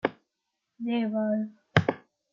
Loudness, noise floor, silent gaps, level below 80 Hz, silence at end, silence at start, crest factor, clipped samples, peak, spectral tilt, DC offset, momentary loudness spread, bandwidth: -29 LUFS; -83 dBFS; none; -64 dBFS; 0.35 s; 0.05 s; 26 dB; under 0.1%; -4 dBFS; -7.5 dB/octave; under 0.1%; 9 LU; 7.2 kHz